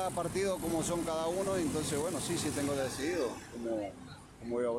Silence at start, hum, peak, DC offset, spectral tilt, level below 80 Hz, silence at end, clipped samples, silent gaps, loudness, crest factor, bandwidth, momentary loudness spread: 0 s; none; -22 dBFS; under 0.1%; -4.5 dB/octave; -58 dBFS; 0 s; under 0.1%; none; -35 LUFS; 12 dB; 16 kHz; 8 LU